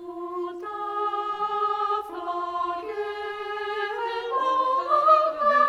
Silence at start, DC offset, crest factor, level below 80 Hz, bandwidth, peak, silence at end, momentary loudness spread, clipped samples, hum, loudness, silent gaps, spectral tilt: 0 s; under 0.1%; 18 dB; -68 dBFS; 11 kHz; -8 dBFS; 0 s; 13 LU; under 0.1%; none; -26 LUFS; none; -3.5 dB/octave